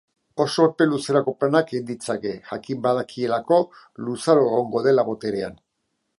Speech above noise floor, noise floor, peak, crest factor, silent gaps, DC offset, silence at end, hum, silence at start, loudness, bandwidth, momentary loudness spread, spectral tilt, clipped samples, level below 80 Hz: 54 dB; -75 dBFS; -2 dBFS; 20 dB; none; under 0.1%; 0.65 s; none; 0.35 s; -22 LUFS; 11.5 kHz; 12 LU; -6 dB/octave; under 0.1%; -64 dBFS